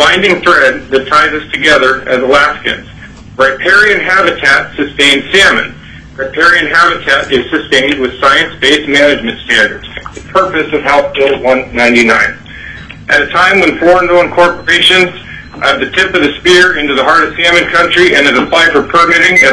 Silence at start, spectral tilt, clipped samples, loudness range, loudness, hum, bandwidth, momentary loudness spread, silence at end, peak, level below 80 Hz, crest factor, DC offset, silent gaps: 0 s; -3 dB/octave; 0.7%; 3 LU; -7 LUFS; none; 11 kHz; 8 LU; 0 s; 0 dBFS; -36 dBFS; 8 dB; under 0.1%; none